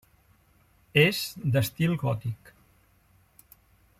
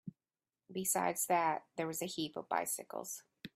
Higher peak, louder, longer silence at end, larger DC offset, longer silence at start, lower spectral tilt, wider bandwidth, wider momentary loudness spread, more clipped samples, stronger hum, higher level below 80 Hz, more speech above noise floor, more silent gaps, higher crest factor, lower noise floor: first, -6 dBFS vs -20 dBFS; first, -26 LUFS vs -37 LUFS; first, 1.65 s vs 0.05 s; neither; first, 0.95 s vs 0.05 s; first, -5.5 dB/octave vs -3 dB/octave; about the same, 16.5 kHz vs 16 kHz; about the same, 12 LU vs 13 LU; neither; neither; first, -60 dBFS vs -82 dBFS; second, 37 dB vs over 53 dB; neither; about the same, 22 dB vs 20 dB; second, -63 dBFS vs under -90 dBFS